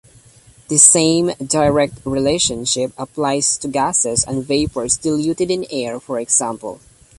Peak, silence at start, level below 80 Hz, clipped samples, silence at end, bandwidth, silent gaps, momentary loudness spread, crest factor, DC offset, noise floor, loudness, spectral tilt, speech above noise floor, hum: 0 dBFS; 0.7 s; -44 dBFS; under 0.1%; 0.45 s; 12 kHz; none; 14 LU; 18 dB; under 0.1%; -47 dBFS; -16 LUFS; -3 dB/octave; 30 dB; none